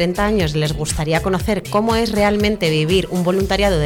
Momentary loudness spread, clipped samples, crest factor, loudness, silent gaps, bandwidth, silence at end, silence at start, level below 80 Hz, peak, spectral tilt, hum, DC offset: 4 LU; under 0.1%; 12 dB; -17 LUFS; none; 17.5 kHz; 0 s; 0 s; -30 dBFS; -6 dBFS; -5 dB/octave; none; under 0.1%